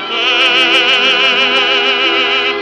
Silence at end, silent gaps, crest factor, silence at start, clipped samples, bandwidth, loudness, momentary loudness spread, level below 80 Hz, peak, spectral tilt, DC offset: 0 s; none; 12 dB; 0 s; under 0.1%; 11.5 kHz; -9 LUFS; 3 LU; -56 dBFS; 0 dBFS; -1 dB/octave; under 0.1%